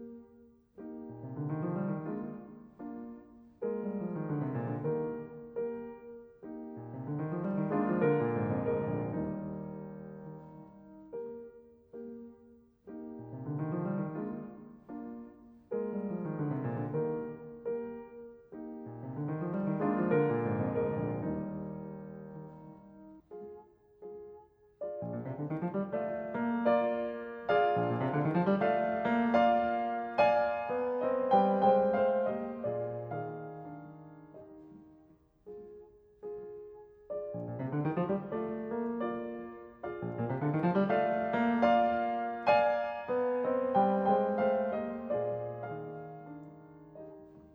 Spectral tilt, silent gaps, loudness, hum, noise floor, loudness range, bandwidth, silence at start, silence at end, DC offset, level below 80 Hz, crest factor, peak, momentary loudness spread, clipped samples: -9.5 dB/octave; none; -33 LUFS; none; -63 dBFS; 15 LU; 6.4 kHz; 0 s; 0.05 s; under 0.1%; -68 dBFS; 20 dB; -14 dBFS; 22 LU; under 0.1%